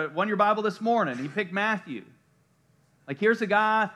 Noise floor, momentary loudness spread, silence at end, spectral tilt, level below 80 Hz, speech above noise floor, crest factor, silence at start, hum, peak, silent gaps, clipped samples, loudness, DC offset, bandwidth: -65 dBFS; 11 LU; 0 s; -6 dB/octave; -84 dBFS; 40 dB; 18 dB; 0 s; none; -8 dBFS; none; under 0.1%; -25 LUFS; under 0.1%; 11.5 kHz